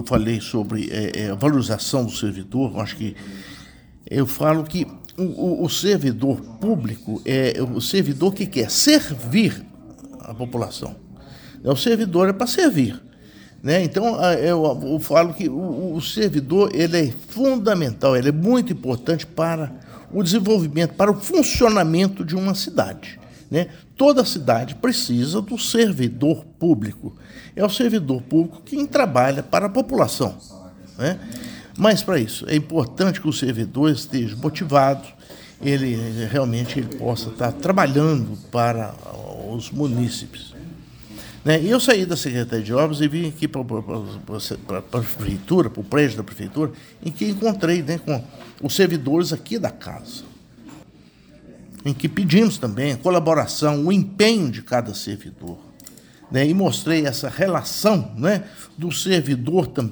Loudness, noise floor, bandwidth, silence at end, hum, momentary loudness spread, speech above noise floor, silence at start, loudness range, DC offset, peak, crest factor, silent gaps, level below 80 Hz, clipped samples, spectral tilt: -20 LUFS; -49 dBFS; over 20 kHz; 0 s; none; 13 LU; 29 dB; 0 s; 4 LU; under 0.1%; 0 dBFS; 20 dB; none; -48 dBFS; under 0.1%; -5.5 dB/octave